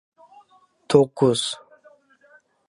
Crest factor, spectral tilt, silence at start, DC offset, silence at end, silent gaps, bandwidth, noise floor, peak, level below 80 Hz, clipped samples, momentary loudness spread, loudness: 22 dB; -5 dB/octave; 0.9 s; under 0.1%; 1.15 s; none; 11.5 kHz; -57 dBFS; -2 dBFS; -64 dBFS; under 0.1%; 12 LU; -20 LUFS